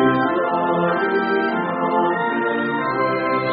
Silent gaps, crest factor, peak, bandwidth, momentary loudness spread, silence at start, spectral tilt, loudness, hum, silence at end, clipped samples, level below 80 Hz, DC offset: none; 16 dB; -4 dBFS; 5 kHz; 2 LU; 0 s; -4 dB/octave; -20 LUFS; none; 0 s; under 0.1%; -60 dBFS; under 0.1%